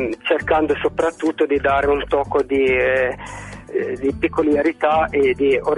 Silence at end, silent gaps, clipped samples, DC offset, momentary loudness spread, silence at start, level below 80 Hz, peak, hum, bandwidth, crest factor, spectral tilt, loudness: 0 s; none; under 0.1%; under 0.1%; 7 LU; 0 s; -40 dBFS; -4 dBFS; none; 11.5 kHz; 14 dB; -6 dB/octave; -19 LUFS